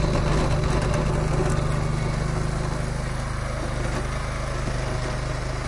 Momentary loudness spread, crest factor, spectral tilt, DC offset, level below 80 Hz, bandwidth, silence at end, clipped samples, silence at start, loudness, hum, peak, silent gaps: 6 LU; 14 dB; -6 dB/octave; under 0.1%; -28 dBFS; 11.5 kHz; 0 s; under 0.1%; 0 s; -26 LUFS; none; -10 dBFS; none